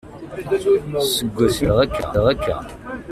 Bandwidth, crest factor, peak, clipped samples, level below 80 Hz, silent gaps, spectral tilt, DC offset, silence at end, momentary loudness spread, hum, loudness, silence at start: 16 kHz; 16 dB; -4 dBFS; under 0.1%; -36 dBFS; none; -5 dB/octave; under 0.1%; 0 s; 15 LU; none; -19 LUFS; 0.05 s